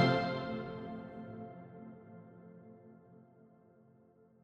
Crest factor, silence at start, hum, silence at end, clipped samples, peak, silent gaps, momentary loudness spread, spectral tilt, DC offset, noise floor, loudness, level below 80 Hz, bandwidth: 26 dB; 0 s; none; 1 s; under 0.1%; -14 dBFS; none; 24 LU; -7 dB/octave; under 0.1%; -65 dBFS; -40 LUFS; -70 dBFS; 7.8 kHz